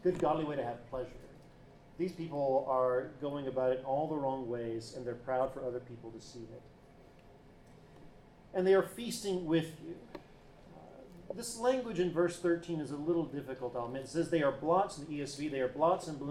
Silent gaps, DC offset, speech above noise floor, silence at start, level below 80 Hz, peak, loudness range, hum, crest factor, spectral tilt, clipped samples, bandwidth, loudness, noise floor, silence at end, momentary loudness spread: none; under 0.1%; 24 dB; 0 s; -62 dBFS; -18 dBFS; 7 LU; none; 18 dB; -6 dB/octave; under 0.1%; 15 kHz; -35 LUFS; -58 dBFS; 0 s; 18 LU